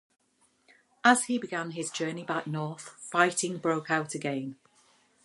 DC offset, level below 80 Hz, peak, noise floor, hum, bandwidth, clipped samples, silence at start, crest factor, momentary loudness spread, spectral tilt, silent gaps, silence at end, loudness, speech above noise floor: under 0.1%; -80 dBFS; -6 dBFS; -68 dBFS; none; 11.5 kHz; under 0.1%; 1.05 s; 24 dB; 12 LU; -3.5 dB/octave; none; 0.7 s; -29 LUFS; 39 dB